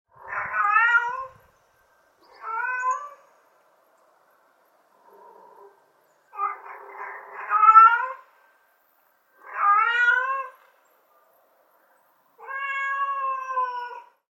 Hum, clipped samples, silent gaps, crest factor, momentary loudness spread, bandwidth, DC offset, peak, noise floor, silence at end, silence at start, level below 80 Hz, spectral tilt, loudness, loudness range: none; under 0.1%; none; 24 dB; 23 LU; 7.6 kHz; under 0.1%; -2 dBFS; -64 dBFS; 0.35 s; 0.25 s; -76 dBFS; -0.5 dB/octave; -21 LUFS; 18 LU